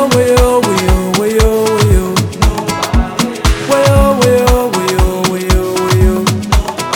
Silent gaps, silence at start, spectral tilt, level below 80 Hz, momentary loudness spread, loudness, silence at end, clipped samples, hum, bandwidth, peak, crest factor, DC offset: none; 0 s; -5 dB/octave; -16 dBFS; 5 LU; -12 LUFS; 0 s; under 0.1%; none; 18.5 kHz; 0 dBFS; 10 dB; under 0.1%